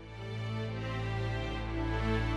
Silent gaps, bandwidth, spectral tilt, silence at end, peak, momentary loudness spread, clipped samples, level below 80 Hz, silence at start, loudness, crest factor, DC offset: none; 8.8 kHz; -7 dB/octave; 0 s; -20 dBFS; 6 LU; under 0.1%; -40 dBFS; 0 s; -36 LUFS; 14 dB; under 0.1%